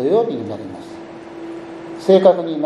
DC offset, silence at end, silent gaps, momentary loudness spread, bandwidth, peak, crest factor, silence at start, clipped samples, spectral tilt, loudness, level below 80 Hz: under 0.1%; 0 s; none; 22 LU; 10.5 kHz; 0 dBFS; 18 dB; 0 s; under 0.1%; -7.5 dB/octave; -16 LUFS; -62 dBFS